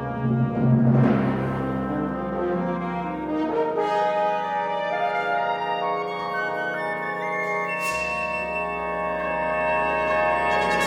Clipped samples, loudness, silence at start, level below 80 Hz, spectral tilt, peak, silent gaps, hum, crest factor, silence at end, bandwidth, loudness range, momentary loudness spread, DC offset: under 0.1%; -24 LUFS; 0 s; -50 dBFS; -7 dB/octave; -8 dBFS; none; none; 16 dB; 0 s; 16 kHz; 2 LU; 6 LU; under 0.1%